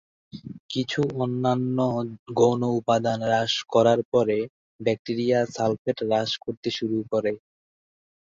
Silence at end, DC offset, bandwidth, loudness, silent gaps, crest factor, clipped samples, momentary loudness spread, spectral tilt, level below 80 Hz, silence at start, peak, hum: 0.9 s; under 0.1%; 7.8 kHz; -25 LUFS; 0.60-0.69 s, 2.19-2.26 s, 4.05-4.12 s, 4.50-4.79 s, 4.99-5.05 s, 5.78-5.85 s, 6.57-6.63 s; 20 dB; under 0.1%; 9 LU; -6 dB/octave; -62 dBFS; 0.35 s; -6 dBFS; none